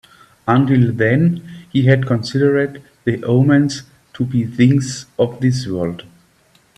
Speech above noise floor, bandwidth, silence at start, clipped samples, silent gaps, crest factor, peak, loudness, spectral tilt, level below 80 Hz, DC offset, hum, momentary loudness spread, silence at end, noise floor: 40 dB; 10.5 kHz; 0.45 s; under 0.1%; none; 16 dB; 0 dBFS; -16 LUFS; -7 dB/octave; -52 dBFS; under 0.1%; none; 11 LU; 0.75 s; -55 dBFS